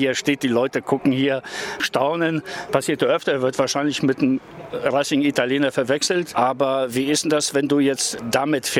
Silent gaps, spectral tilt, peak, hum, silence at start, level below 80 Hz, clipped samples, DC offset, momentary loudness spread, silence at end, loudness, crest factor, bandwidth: none; -4 dB/octave; -2 dBFS; none; 0 s; -62 dBFS; under 0.1%; under 0.1%; 4 LU; 0 s; -21 LUFS; 18 dB; 16.5 kHz